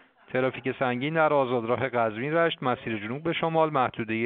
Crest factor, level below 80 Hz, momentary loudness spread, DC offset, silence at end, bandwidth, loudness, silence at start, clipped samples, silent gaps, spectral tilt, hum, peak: 18 dB; -66 dBFS; 7 LU; under 0.1%; 0 s; 4.5 kHz; -26 LUFS; 0.3 s; under 0.1%; none; -4 dB/octave; none; -8 dBFS